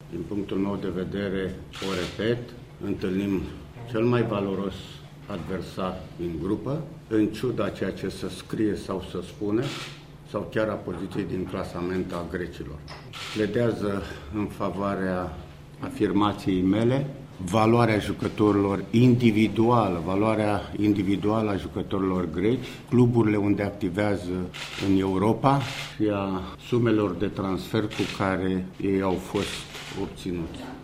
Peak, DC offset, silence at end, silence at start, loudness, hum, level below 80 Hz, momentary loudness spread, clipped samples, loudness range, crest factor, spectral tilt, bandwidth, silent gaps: -6 dBFS; under 0.1%; 0 s; 0 s; -26 LUFS; none; -50 dBFS; 13 LU; under 0.1%; 8 LU; 20 dB; -7 dB/octave; 15.5 kHz; none